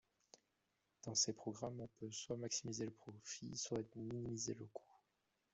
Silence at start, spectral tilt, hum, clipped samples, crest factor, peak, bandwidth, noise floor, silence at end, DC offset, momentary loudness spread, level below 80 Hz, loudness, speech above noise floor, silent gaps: 1.05 s; -3.5 dB/octave; none; under 0.1%; 24 dB; -24 dBFS; 8.2 kHz; -86 dBFS; 0.6 s; under 0.1%; 13 LU; -78 dBFS; -45 LUFS; 39 dB; none